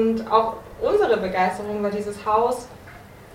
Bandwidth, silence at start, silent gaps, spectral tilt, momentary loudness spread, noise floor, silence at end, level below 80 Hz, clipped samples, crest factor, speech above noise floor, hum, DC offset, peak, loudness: 16 kHz; 0 s; none; -5.5 dB/octave; 9 LU; -43 dBFS; 0 s; -50 dBFS; under 0.1%; 20 dB; 21 dB; none; under 0.1%; -4 dBFS; -22 LUFS